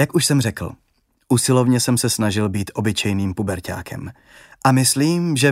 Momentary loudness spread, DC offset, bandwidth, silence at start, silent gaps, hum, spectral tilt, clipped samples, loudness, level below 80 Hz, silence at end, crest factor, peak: 14 LU; under 0.1%; 16 kHz; 0 s; none; none; -4.5 dB/octave; under 0.1%; -19 LUFS; -50 dBFS; 0 s; 18 dB; -2 dBFS